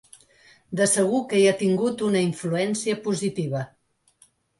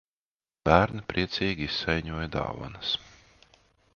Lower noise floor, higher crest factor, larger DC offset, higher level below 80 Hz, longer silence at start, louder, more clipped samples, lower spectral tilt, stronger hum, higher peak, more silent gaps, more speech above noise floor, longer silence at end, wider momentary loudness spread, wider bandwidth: second, -61 dBFS vs under -90 dBFS; second, 16 dB vs 26 dB; neither; second, -68 dBFS vs -46 dBFS; about the same, 0.7 s vs 0.65 s; first, -23 LUFS vs -28 LUFS; neither; second, -4.5 dB/octave vs -6 dB/octave; neither; second, -8 dBFS vs -2 dBFS; neither; second, 38 dB vs over 62 dB; about the same, 0.95 s vs 0.85 s; about the same, 10 LU vs 10 LU; first, 11.5 kHz vs 7.2 kHz